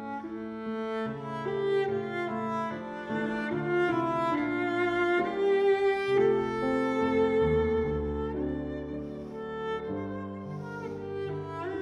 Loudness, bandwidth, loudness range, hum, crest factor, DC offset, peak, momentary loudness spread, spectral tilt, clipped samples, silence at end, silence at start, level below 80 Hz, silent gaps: -30 LUFS; 10 kHz; 9 LU; none; 14 dB; under 0.1%; -14 dBFS; 12 LU; -7.5 dB/octave; under 0.1%; 0 s; 0 s; -50 dBFS; none